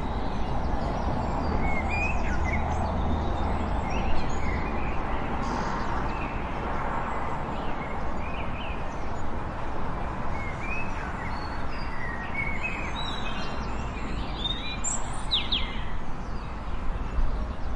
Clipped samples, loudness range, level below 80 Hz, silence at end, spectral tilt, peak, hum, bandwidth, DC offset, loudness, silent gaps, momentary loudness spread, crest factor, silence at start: under 0.1%; 5 LU; -32 dBFS; 0 s; -4.5 dB/octave; -12 dBFS; none; 9.4 kHz; under 0.1%; -31 LUFS; none; 6 LU; 16 dB; 0 s